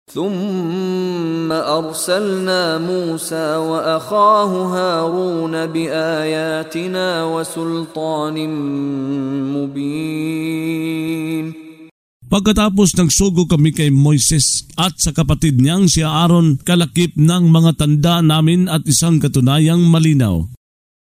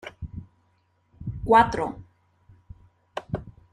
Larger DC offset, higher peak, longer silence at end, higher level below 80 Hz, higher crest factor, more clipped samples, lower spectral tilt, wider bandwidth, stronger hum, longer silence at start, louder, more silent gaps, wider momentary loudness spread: neither; first, 0 dBFS vs -6 dBFS; first, 0.5 s vs 0.25 s; first, -36 dBFS vs -48 dBFS; second, 14 dB vs 22 dB; neither; second, -5 dB/octave vs -6.5 dB/octave; first, 16 kHz vs 11.5 kHz; neither; about the same, 0.1 s vs 0.05 s; first, -15 LUFS vs -23 LUFS; first, 11.91-12.20 s vs none; second, 9 LU vs 22 LU